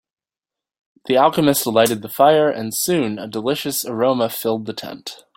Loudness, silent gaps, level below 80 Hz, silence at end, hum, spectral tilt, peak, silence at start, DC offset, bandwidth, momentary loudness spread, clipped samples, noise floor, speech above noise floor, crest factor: -18 LUFS; none; -60 dBFS; 0.25 s; none; -4 dB/octave; -2 dBFS; 1.1 s; under 0.1%; 17 kHz; 14 LU; under 0.1%; -88 dBFS; 70 dB; 18 dB